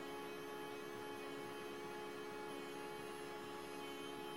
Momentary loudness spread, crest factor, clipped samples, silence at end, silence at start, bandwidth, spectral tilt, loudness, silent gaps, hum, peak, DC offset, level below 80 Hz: 1 LU; 12 dB; under 0.1%; 0 s; 0 s; 16 kHz; -4 dB/octave; -49 LUFS; none; none; -38 dBFS; under 0.1%; -78 dBFS